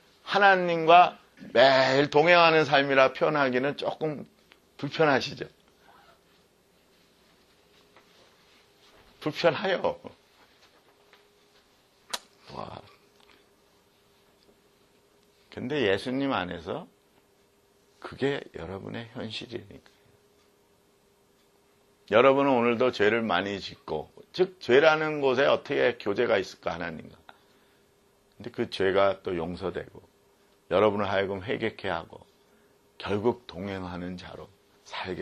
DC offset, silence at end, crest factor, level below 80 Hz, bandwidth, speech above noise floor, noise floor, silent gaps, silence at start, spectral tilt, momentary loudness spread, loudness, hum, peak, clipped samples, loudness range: under 0.1%; 0 s; 24 dB; -64 dBFS; 13 kHz; 39 dB; -64 dBFS; none; 0.25 s; -5.5 dB/octave; 21 LU; -25 LUFS; none; -4 dBFS; under 0.1%; 20 LU